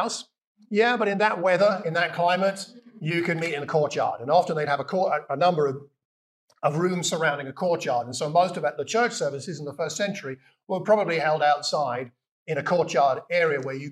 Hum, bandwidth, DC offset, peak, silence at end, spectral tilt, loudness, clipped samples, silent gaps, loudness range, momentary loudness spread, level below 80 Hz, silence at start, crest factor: none; 13 kHz; under 0.1%; -8 dBFS; 0 s; -4.5 dB/octave; -24 LUFS; under 0.1%; 0.47-0.55 s, 6.05-6.48 s, 12.28-12.46 s; 2 LU; 11 LU; -82 dBFS; 0 s; 18 dB